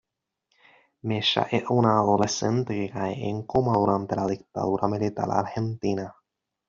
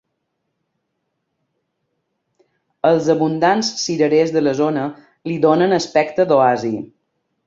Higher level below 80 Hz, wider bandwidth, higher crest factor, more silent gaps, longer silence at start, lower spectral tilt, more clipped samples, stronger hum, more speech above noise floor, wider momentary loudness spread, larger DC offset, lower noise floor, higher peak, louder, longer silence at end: first, -58 dBFS vs -64 dBFS; about the same, 7.6 kHz vs 7.8 kHz; about the same, 22 dB vs 18 dB; neither; second, 1.05 s vs 2.85 s; about the same, -5 dB/octave vs -5 dB/octave; neither; neither; second, 52 dB vs 57 dB; second, 8 LU vs 12 LU; neither; first, -77 dBFS vs -73 dBFS; about the same, -4 dBFS vs -2 dBFS; second, -25 LUFS vs -17 LUFS; about the same, 0.55 s vs 0.6 s